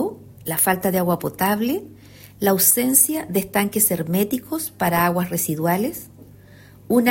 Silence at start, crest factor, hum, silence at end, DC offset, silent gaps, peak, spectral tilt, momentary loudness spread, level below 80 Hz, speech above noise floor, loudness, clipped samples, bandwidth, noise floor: 0 s; 20 dB; none; 0 s; under 0.1%; none; 0 dBFS; -4 dB/octave; 11 LU; -54 dBFS; 26 dB; -19 LUFS; under 0.1%; 16.5 kHz; -46 dBFS